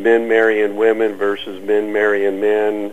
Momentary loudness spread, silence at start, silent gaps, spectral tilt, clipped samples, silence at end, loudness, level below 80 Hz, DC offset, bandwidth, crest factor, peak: 6 LU; 0 s; none; -5.5 dB/octave; under 0.1%; 0 s; -16 LUFS; -58 dBFS; 1%; 9 kHz; 14 dB; -2 dBFS